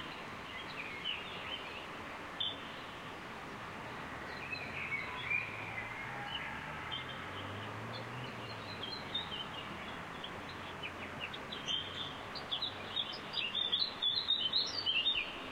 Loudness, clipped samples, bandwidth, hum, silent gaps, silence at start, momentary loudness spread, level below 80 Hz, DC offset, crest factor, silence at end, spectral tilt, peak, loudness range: -38 LUFS; under 0.1%; 16 kHz; none; none; 0 s; 13 LU; -64 dBFS; under 0.1%; 20 dB; 0 s; -3 dB/octave; -20 dBFS; 8 LU